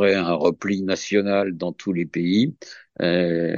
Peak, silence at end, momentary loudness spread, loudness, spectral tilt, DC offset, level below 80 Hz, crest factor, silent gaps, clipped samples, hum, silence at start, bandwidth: -6 dBFS; 0 s; 6 LU; -22 LUFS; -6 dB/octave; under 0.1%; -62 dBFS; 16 dB; none; under 0.1%; none; 0 s; 7.4 kHz